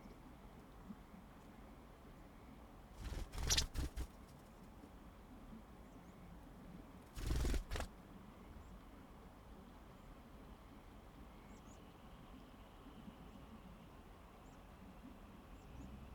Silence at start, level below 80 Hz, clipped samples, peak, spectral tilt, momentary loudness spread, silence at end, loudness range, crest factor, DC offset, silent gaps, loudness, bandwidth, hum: 0 s; -52 dBFS; under 0.1%; -22 dBFS; -3.5 dB/octave; 15 LU; 0 s; 14 LU; 28 dB; under 0.1%; none; -51 LUFS; 19.5 kHz; none